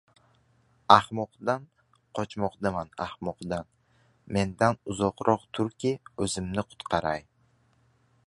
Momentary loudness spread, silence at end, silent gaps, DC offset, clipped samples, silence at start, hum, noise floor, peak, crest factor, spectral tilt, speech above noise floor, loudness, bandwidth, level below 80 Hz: 15 LU; 1.05 s; none; under 0.1%; under 0.1%; 0.9 s; none; -66 dBFS; 0 dBFS; 28 dB; -5 dB/octave; 38 dB; -28 LUFS; 11.5 kHz; -54 dBFS